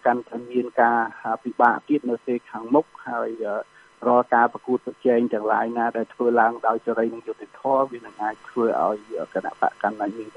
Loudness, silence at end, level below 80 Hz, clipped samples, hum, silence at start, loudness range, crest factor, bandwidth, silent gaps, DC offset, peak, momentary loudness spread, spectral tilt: -23 LUFS; 0.05 s; -74 dBFS; under 0.1%; none; 0.05 s; 4 LU; 20 dB; 9.6 kHz; none; under 0.1%; -4 dBFS; 10 LU; -7.5 dB/octave